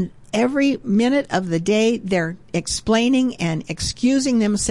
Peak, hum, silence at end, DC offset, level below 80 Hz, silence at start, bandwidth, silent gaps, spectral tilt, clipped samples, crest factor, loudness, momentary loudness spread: -8 dBFS; none; 0 s; 0.4%; -44 dBFS; 0 s; 11.5 kHz; none; -4.5 dB/octave; under 0.1%; 12 dB; -20 LUFS; 7 LU